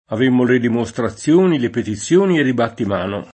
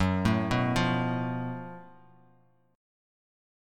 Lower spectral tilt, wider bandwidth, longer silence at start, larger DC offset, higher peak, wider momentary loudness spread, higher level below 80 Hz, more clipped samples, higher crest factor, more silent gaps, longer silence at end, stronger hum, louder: about the same, -6 dB/octave vs -6.5 dB/octave; second, 8.8 kHz vs 13.5 kHz; about the same, 0.1 s vs 0 s; neither; first, -2 dBFS vs -12 dBFS; second, 8 LU vs 15 LU; about the same, -54 dBFS vs -50 dBFS; neither; second, 14 dB vs 20 dB; neither; second, 0.1 s vs 1.85 s; neither; first, -17 LUFS vs -28 LUFS